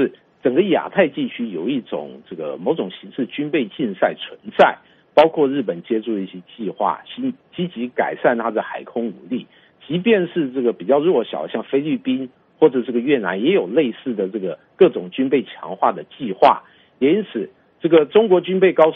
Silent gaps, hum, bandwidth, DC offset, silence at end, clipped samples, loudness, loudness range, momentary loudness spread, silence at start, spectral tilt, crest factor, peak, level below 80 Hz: none; none; 5.2 kHz; under 0.1%; 0 s; under 0.1%; -19 LUFS; 4 LU; 13 LU; 0 s; -4.5 dB/octave; 20 dB; 0 dBFS; -66 dBFS